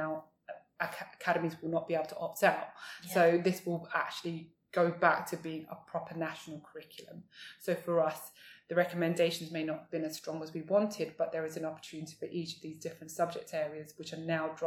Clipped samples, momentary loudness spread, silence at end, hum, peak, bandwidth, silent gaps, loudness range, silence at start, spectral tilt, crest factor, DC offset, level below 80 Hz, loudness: under 0.1%; 17 LU; 0 s; none; -10 dBFS; 19 kHz; none; 6 LU; 0 s; -5 dB/octave; 24 dB; under 0.1%; -80 dBFS; -34 LUFS